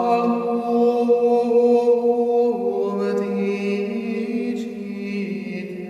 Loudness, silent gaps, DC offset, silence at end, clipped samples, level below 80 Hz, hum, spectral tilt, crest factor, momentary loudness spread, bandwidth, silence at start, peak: -21 LUFS; none; under 0.1%; 0 s; under 0.1%; -68 dBFS; none; -7.5 dB/octave; 14 dB; 11 LU; 7.6 kHz; 0 s; -6 dBFS